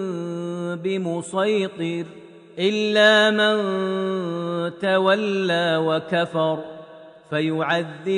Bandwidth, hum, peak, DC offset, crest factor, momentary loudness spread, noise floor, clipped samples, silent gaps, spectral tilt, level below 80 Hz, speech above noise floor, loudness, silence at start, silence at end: 10 kHz; none; -4 dBFS; under 0.1%; 18 dB; 12 LU; -43 dBFS; under 0.1%; none; -5 dB/octave; -74 dBFS; 22 dB; -21 LUFS; 0 s; 0 s